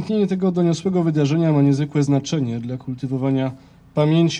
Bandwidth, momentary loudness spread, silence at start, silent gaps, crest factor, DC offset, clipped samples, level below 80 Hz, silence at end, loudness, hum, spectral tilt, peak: 9.2 kHz; 11 LU; 0 s; none; 12 dB; under 0.1%; under 0.1%; -56 dBFS; 0 s; -20 LUFS; none; -7.5 dB/octave; -6 dBFS